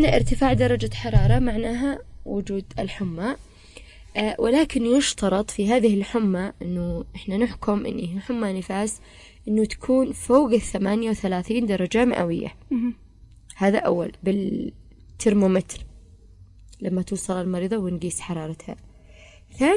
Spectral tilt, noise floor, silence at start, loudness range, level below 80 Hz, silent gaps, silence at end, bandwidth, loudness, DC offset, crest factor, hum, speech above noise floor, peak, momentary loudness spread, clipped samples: -6 dB/octave; -48 dBFS; 0 s; 5 LU; -36 dBFS; none; 0 s; 11.5 kHz; -24 LUFS; under 0.1%; 20 dB; none; 26 dB; -4 dBFS; 11 LU; under 0.1%